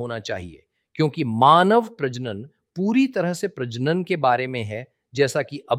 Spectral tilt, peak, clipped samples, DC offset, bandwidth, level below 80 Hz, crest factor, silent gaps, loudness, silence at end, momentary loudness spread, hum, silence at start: -6 dB/octave; -2 dBFS; under 0.1%; under 0.1%; 14.5 kHz; -62 dBFS; 20 dB; none; -21 LUFS; 0 s; 18 LU; none; 0 s